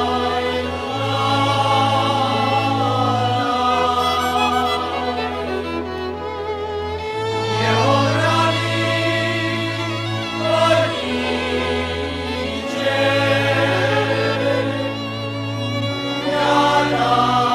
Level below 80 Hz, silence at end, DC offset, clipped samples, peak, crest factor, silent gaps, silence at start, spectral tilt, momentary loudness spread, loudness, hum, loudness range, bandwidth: -48 dBFS; 0 s; under 0.1%; under 0.1%; -4 dBFS; 14 dB; none; 0 s; -5 dB/octave; 8 LU; -19 LUFS; none; 3 LU; 15 kHz